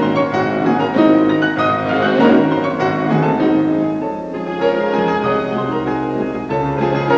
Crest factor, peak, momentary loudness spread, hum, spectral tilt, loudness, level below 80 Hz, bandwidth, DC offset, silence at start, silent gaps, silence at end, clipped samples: 14 dB; -2 dBFS; 8 LU; none; -8 dB/octave; -16 LUFS; -46 dBFS; 7.2 kHz; under 0.1%; 0 s; none; 0 s; under 0.1%